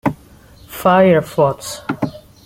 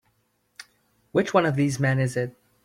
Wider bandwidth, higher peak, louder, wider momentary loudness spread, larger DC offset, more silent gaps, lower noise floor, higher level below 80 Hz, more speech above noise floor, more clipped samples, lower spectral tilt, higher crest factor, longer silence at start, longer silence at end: first, 16.5 kHz vs 14 kHz; first, -2 dBFS vs -6 dBFS; first, -16 LUFS vs -24 LUFS; first, 16 LU vs 8 LU; neither; neither; second, -43 dBFS vs -69 dBFS; first, -48 dBFS vs -60 dBFS; second, 29 dB vs 47 dB; neither; about the same, -6 dB/octave vs -6.5 dB/octave; about the same, 16 dB vs 20 dB; second, 0.05 s vs 0.6 s; about the same, 0.3 s vs 0.35 s